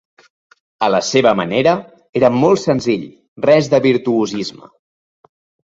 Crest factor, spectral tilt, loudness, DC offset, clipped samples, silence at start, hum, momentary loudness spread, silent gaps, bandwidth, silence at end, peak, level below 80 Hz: 16 dB; -5.5 dB/octave; -15 LUFS; under 0.1%; under 0.1%; 0.8 s; none; 10 LU; 2.09-2.13 s, 3.28-3.36 s; 7.8 kHz; 1.3 s; 0 dBFS; -56 dBFS